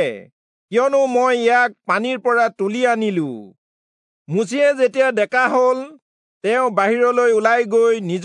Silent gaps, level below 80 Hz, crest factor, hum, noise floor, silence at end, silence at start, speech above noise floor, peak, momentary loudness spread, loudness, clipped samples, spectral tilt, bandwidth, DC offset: 0.32-0.68 s, 3.58-4.25 s, 6.02-6.41 s; -82 dBFS; 16 dB; none; under -90 dBFS; 0 s; 0 s; over 73 dB; -2 dBFS; 9 LU; -17 LUFS; under 0.1%; -5 dB/octave; 10.5 kHz; under 0.1%